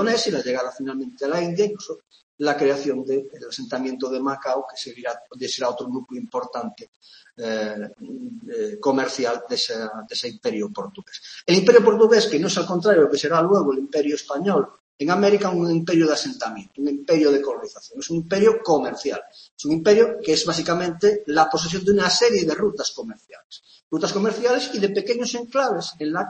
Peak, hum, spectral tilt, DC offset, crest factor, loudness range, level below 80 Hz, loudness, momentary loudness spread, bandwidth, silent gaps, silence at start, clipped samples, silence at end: 0 dBFS; none; -4.5 dB/octave; under 0.1%; 22 dB; 10 LU; -62 dBFS; -21 LUFS; 15 LU; 8.8 kHz; 2.23-2.38 s, 6.88-7.00 s, 14.80-14.99 s, 19.51-19.57 s, 23.44-23.50 s, 23.83-23.91 s; 0 s; under 0.1%; 0 s